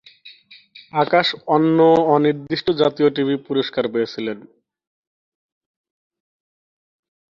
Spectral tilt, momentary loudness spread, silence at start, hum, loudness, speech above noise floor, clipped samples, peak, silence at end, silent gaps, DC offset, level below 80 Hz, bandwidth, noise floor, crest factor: -7 dB/octave; 11 LU; 0.25 s; none; -18 LUFS; 29 dB; under 0.1%; -2 dBFS; 3 s; none; under 0.1%; -62 dBFS; 7.2 kHz; -46 dBFS; 18 dB